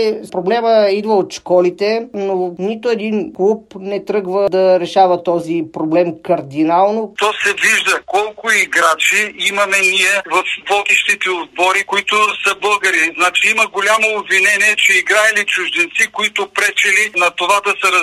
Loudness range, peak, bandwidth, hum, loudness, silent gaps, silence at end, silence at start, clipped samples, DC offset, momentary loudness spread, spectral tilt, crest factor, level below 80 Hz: 4 LU; 0 dBFS; 14.5 kHz; none; -13 LUFS; none; 0 s; 0 s; under 0.1%; under 0.1%; 8 LU; -2.5 dB/octave; 14 dB; -62 dBFS